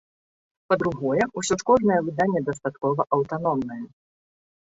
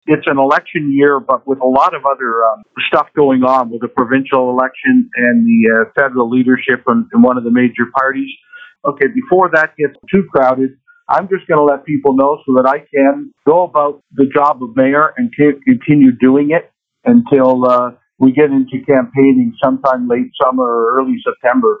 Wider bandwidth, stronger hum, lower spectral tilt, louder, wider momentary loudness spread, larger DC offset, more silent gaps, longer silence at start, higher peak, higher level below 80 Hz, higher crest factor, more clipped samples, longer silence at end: first, 8 kHz vs 5 kHz; neither; second, -5.5 dB/octave vs -8.5 dB/octave; second, -24 LUFS vs -12 LUFS; first, 9 LU vs 6 LU; neither; neither; first, 0.7 s vs 0.05 s; second, -6 dBFS vs 0 dBFS; about the same, -58 dBFS vs -56 dBFS; first, 18 dB vs 12 dB; neither; first, 0.85 s vs 0.05 s